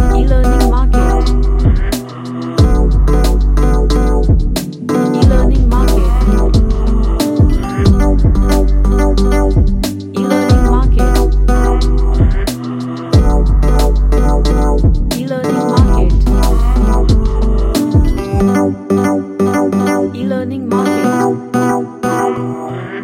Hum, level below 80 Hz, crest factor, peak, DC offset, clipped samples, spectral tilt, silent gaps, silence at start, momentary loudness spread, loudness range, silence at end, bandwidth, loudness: none; -12 dBFS; 10 dB; 0 dBFS; under 0.1%; under 0.1%; -7 dB/octave; none; 0 s; 6 LU; 1 LU; 0 s; 15 kHz; -13 LUFS